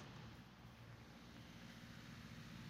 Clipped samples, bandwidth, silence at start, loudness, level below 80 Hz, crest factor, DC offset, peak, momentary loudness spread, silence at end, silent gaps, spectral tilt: under 0.1%; 16 kHz; 0 s; -58 LUFS; -70 dBFS; 14 dB; under 0.1%; -44 dBFS; 4 LU; 0 s; none; -5 dB/octave